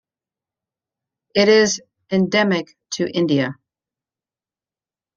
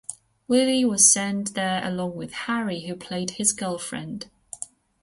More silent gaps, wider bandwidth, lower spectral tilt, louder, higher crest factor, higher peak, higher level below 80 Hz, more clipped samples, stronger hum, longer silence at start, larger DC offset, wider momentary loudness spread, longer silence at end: neither; second, 7.6 kHz vs 12 kHz; first, -4.5 dB/octave vs -2.5 dB/octave; first, -18 LUFS vs -23 LUFS; about the same, 18 dB vs 22 dB; about the same, -4 dBFS vs -2 dBFS; about the same, -64 dBFS vs -62 dBFS; neither; neither; first, 1.35 s vs 0.1 s; neither; second, 12 LU vs 21 LU; first, 1.65 s vs 0.35 s